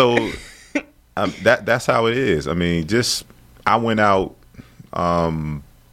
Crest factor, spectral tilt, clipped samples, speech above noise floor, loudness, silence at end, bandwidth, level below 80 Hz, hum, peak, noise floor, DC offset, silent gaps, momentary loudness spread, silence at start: 18 dB; -5 dB/octave; under 0.1%; 25 dB; -20 LUFS; 0.3 s; 16 kHz; -42 dBFS; none; -2 dBFS; -43 dBFS; under 0.1%; none; 13 LU; 0 s